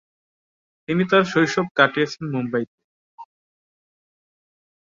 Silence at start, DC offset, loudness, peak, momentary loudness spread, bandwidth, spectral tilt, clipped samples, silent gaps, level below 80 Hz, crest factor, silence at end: 0.9 s; under 0.1%; -20 LUFS; -2 dBFS; 9 LU; 7.6 kHz; -5.5 dB/octave; under 0.1%; 1.71-1.75 s, 2.67-2.78 s, 2.84-3.18 s; -66 dBFS; 22 dB; 1.65 s